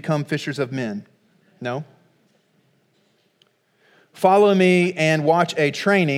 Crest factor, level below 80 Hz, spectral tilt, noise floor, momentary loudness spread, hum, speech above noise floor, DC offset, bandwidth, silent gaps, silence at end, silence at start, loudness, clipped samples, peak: 20 dB; -78 dBFS; -6 dB/octave; -63 dBFS; 15 LU; none; 45 dB; under 0.1%; 15.5 kHz; none; 0 s; 0.05 s; -19 LUFS; under 0.1%; -2 dBFS